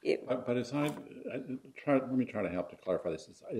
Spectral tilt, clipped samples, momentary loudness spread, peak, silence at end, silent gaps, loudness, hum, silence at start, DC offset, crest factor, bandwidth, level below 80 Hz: -6.5 dB/octave; under 0.1%; 11 LU; -16 dBFS; 0 s; none; -35 LUFS; none; 0.05 s; under 0.1%; 18 dB; 15 kHz; -70 dBFS